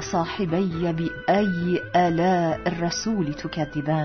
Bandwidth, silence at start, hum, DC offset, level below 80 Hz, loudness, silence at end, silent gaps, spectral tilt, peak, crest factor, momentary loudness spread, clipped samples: 6.6 kHz; 0 s; none; under 0.1%; -48 dBFS; -24 LUFS; 0 s; none; -6 dB/octave; -8 dBFS; 16 dB; 6 LU; under 0.1%